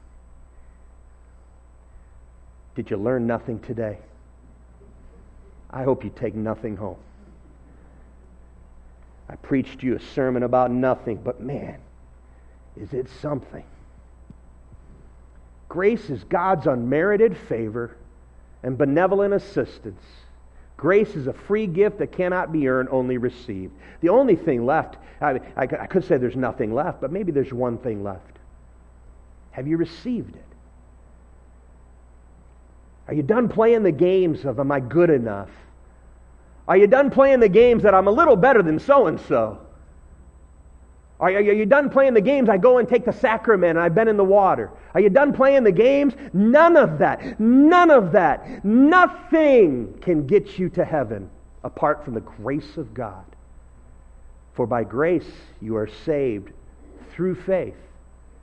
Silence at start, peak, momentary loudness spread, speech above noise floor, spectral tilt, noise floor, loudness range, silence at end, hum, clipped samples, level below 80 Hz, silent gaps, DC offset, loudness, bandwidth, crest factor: 0.6 s; -2 dBFS; 17 LU; 29 dB; -8.5 dB/octave; -49 dBFS; 16 LU; 0.7 s; none; under 0.1%; -48 dBFS; none; under 0.1%; -19 LUFS; 8.4 kHz; 20 dB